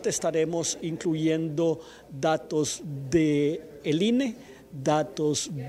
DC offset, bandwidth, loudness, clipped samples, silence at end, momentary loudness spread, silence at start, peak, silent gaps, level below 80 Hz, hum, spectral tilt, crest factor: under 0.1%; 14.5 kHz; -27 LUFS; under 0.1%; 0 s; 9 LU; 0 s; -10 dBFS; none; -60 dBFS; none; -5 dB/octave; 16 dB